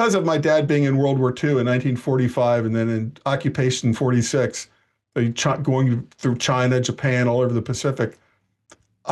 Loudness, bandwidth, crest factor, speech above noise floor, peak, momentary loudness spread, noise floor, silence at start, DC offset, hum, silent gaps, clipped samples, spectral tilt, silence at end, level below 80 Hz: -21 LUFS; 12 kHz; 12 dB; 36 dB; -10 dBFS; 6 LU; -56 dBFS; 0 s; under 0.1%; none; none; under 0.1%; -6 dB/octave; 0 s; -58 dBFS